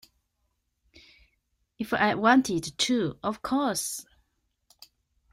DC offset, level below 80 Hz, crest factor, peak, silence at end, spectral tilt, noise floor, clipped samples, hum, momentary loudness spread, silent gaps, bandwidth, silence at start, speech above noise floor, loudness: under 0.1%; -62 dBFS; 22 dB; -8 dBFS; 1.3 s; -3.5 dB/octave; -77 dBFS; under 0.1%; none; 12 LU; none; 16 kHz; 1.8 s; 51 dB; -26 LUFS